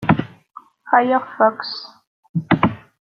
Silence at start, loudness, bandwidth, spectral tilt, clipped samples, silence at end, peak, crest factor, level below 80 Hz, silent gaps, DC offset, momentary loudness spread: 0 s; -19 LUFS; 6.2 kHz; -8.5 dB/octave; under 0.1%; 0.3 s; -2 dBFS; 18 dB; -52 dBFS; 2.07-2.23 s, 2.29-2.34 s; under 0.1%; 15 LU